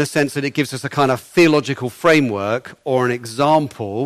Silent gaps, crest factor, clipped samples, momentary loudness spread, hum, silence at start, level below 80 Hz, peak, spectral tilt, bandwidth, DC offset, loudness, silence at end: none; 14 dB; under 0.1%; 8 LU; none; 0 s; -58 dBFS; -4 dBFS; -5.5 dB/octave; 15 kHz; under 0.1%; -18 LUFS; 0 s